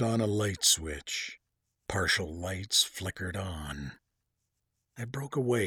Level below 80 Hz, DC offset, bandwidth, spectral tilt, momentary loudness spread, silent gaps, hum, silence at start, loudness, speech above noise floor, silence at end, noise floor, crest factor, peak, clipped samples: -52 dBFS; under 0.1%; 20 kHz; -3 dB/octave; 16 LU; none; none; 0 s; -30 LUFS; 51 dB; 0 s; -82 dBFS; 22 dB; -12 dBFS; under 0.1%